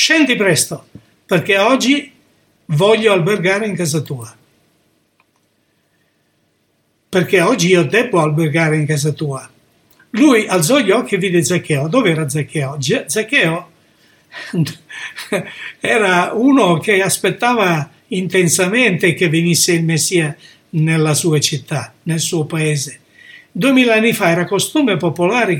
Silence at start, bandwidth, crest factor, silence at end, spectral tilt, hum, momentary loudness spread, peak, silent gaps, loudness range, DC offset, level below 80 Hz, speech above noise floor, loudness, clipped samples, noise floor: 0 s; 18 kHz; 16 dB; 0 s; -4.5 dB/octave; none; 11 LU; 0 dBFS; none; 5 LU; under 0.1%; -62 dBFS; 47 dB; -14 LUFS; under 0.1%; -62 dBFS